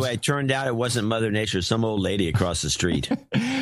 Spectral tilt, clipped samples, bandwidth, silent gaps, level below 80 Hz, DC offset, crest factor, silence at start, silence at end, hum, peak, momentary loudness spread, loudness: -4.5 dB/octave; under 0.1%; 14.5 kHz; none; -44 dBFS; under 0.1%; 18 dB; 0 s; 0 s; none; -6 dBFS; 2 LU; -24 LUFS